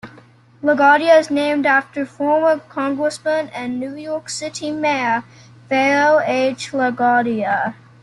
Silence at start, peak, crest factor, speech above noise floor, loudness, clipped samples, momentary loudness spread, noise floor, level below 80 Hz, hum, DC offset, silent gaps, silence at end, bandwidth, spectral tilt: 0.05 s; -2 dBFS; 16 dB; 29 dB; -18 LUFS; under 0.1%; 12 LU; -47 dBFS; -64 dBFS; none; under 0.1%; none; 0.3 s; 11.5 kHz; -4 dB/octave